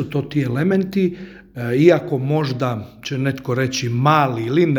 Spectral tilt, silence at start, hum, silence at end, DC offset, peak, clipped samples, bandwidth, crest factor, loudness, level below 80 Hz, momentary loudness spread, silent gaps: -6.5 dB/octave; 0 s; none; 0 s; under 0.1%; 0 dBFS; under 0.1%; 19.5 kHz; 18 dB; -19 LUFS; -54 dBFS; 12 LU; none